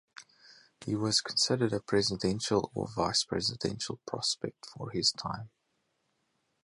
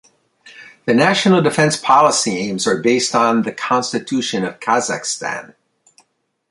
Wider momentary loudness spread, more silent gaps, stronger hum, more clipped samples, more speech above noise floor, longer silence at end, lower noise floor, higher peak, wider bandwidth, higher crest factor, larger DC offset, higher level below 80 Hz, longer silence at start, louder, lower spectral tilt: first, 12 LU vs 9 LU; neither; neither; neither; about the same, 46 dB vs 47 dB; first, 1.2 s vs 1.05 s; first, -78 dBFS vs -63 dBFS; second, -12 dBFS vs 0 dBFS; about the same, 11.5 kHz vs 11.5 kHz; about the same, 20 dB vs 16 dB; neither; about the same, -60 dBFS vs -62 dBFS; second, 0.2 s vs 0.45 s; second, -31 LUFS vs -16 LUFS; about the same, -3.5 dB/octave vs -4 dB/octave